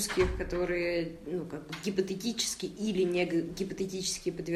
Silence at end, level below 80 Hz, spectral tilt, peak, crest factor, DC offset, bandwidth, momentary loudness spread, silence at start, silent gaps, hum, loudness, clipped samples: 0 s; -48 dBFS; -4 dB/octave; -14 dBFS; 18 dB; under 0.1%; 15 kHz; 8 LU; 0 s; none; none; -32 LUFS; under 0.1%